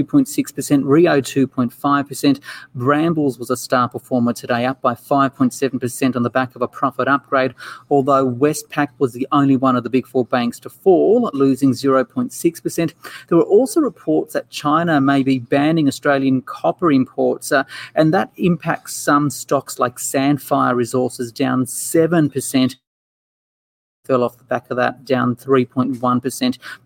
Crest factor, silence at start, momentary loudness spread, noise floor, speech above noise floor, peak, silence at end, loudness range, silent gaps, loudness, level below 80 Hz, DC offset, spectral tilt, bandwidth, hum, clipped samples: 14 dB; 0 s; 7 LU; under -90 dBFS; over 73 dB; -2 dBFS; 0.1 s; 3 LU; 22.87-24.03 s; -18 LUFS; -62 dBFS; under 0.1%; -5.5 dB/octave; 17 kHz; none; under 0.1%